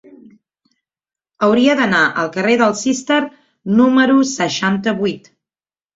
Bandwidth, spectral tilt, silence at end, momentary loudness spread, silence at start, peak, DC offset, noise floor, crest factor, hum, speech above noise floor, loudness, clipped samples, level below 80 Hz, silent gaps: 8 kHz; -4.5 dB/octave; 0.8 s; 8 LU; 1.4 s; -2 dBFS; under 0.1%; under -90 dBFS; 16 dB; none; over 76 dB; -15 LUFS; under 0.1%; -58 dBFS; none